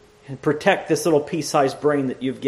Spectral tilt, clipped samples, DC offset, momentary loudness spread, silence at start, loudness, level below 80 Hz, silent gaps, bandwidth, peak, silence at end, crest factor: -5 dB/octave; under 0.1%; under 0.1%; 7 LU; 0.3 s; -21 LUFS; -60 dBFS; none; 13.5 kHz; -2 dBFS; 0 s; 20 dB